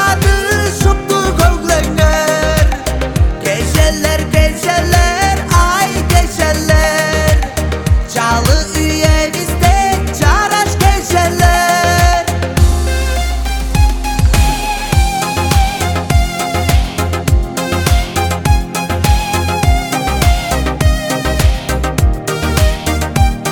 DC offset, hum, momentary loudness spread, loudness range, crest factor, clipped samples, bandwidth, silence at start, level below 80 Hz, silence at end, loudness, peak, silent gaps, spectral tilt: under 0.1%; none; 5 LU; 3 LU; 12 dB; under 0.1%; 19 kHz; 0 s; -16 dBFS; 0 s; -13 LUFS; 0 dBFS; none; -4.5 dB/octave